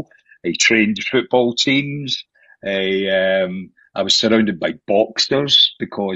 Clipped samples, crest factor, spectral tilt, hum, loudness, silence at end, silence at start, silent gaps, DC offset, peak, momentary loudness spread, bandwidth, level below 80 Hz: under 0.1%; 16 dB; -3 dB/octave; none; -16 LUFS; 0 s; 0 s; none; under 0.1%; -2 dBFS; 12 LU; 8.4 kHz; -58 dBFS